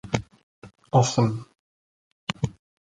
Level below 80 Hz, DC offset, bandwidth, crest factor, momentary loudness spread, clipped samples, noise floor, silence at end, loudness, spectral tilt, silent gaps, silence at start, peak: -52 dBFS; under 0.1%; 9.4 kHz; 24 dB; 14 LU; under 0.1%; under -90 dBFS; 0.3 s; -25 LUFS; -5.5 dB/octave; 0.43-0.62 s, 1.59-2.27 s; 0.05 s; -4 dBFS